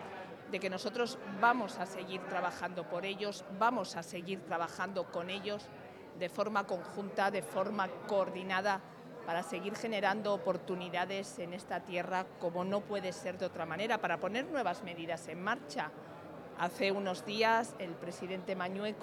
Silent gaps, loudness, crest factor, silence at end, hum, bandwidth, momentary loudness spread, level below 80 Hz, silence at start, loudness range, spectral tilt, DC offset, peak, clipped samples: none; -37 LUFS; 22 dB; 0 s; none; 19 kHz; 9 LU; -82 dBFS; 0 s; 2 LU; -4.5 dB/octave; under 0.1%; -16 dBFS; under 0.1%